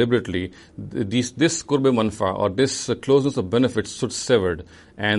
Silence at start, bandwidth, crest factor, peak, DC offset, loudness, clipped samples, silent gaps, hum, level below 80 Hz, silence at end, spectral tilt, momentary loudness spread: 0 s; 11.5 kHz; 18 dB; -4 dBFS; under 0.1%; -22 LUFS; under 0.1%; none; none; -52 dBFS; 0 s; -5 dB/octave; 9 LU